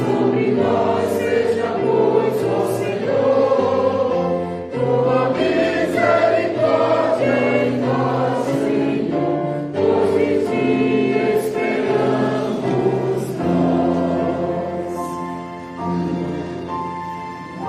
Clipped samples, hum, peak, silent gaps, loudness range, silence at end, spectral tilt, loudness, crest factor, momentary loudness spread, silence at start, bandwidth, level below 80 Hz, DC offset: under 0.1%; none; -4 dBFS; none; 4 LU; 0 s; -7 dB/octave; -19 LUFS; 14 dB; 9 LU; 0 s; 15 kHz; -54 dBFS; under 0.1%